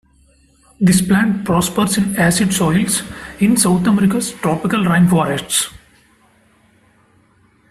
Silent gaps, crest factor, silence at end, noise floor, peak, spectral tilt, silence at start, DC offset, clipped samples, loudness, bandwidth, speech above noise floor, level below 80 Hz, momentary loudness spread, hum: none; 16 dB; 1.95 s; -54 dBFS; 0 dBFS; -4.5 dB/octave; 0.8 s; under 0.1%; under 0.1%; -15 LUFS; 15 kHz; 39 dB; -44 dBFS; 6 LU; none